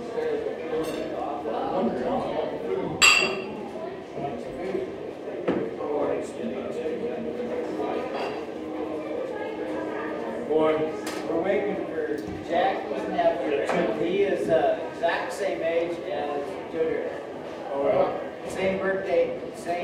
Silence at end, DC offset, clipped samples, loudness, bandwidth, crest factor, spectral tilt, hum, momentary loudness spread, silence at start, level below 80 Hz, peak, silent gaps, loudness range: 0 s; under 0.1%; under 0.1%; -27 LUFS; 16 kHz; 24 dB; -3.5 dB/octave; none; 10 LU; 0 s; -60 dBFS; -4 dBFS; none; 7 LU